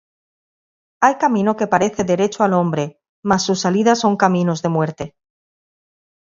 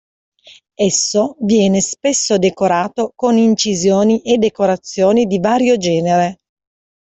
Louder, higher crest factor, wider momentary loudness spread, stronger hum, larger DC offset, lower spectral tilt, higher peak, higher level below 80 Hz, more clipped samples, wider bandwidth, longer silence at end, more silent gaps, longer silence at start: second, -17 LUFS vs -14 LUFS; first, 18 dB vs 12 dB; first, 9 LU vs 4 LU; neither; neither; about the same, -5.5 dB/octave vs -4.5 dB/octave; about the same, 0 dBFS vs -2 dBFS; about the same, -56 dBFS vs -54 dBFS; neither; second, 7.6 kHz vs 8.4 kHz; first, 1.15 s vs 0.7 s; first, 3.09-3.23 s vs none; first, 1 s vs 0.8 s